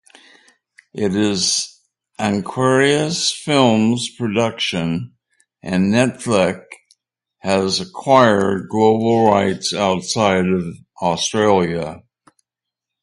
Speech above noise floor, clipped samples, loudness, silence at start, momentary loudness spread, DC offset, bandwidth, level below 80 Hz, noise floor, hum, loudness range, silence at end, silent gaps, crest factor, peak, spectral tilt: 67 dB; under 0.1%; -17 LUFS; 0.95 s; 10 LU; under 0.1%; 11.5 kHz; -50 dBFS; -84 dBFS; none; 4 LU; 1.05 s; none; 18 dB; 0 dBFS; -4.5 dB/octave